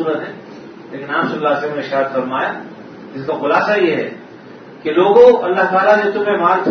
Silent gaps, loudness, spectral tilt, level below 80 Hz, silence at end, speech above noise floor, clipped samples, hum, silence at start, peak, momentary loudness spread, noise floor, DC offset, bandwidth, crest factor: none; -15 LUFS; -6.5 dB/octave; -60 dBFS; 0 s; 22 dB; under 0.1%; none; 0 s; 0 dBFS; 22 LU; -36 dBFS; under 0.1%; 6.4 kHz; 16 dB